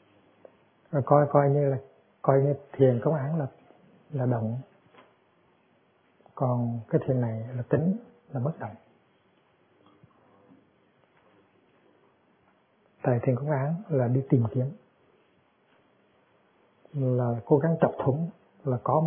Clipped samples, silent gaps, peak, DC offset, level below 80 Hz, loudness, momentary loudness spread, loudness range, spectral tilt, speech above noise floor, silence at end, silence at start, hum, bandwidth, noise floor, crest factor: under 0.1%; none; -6 dBFS; under 0.1%; -68 dBFS; -27 LUFS; 12 LU; 9 LU; -13 dB/octave; 40 dB; 0 s; 0.95 s; none; 3.5 kHz; -66 dBFS; 24 dB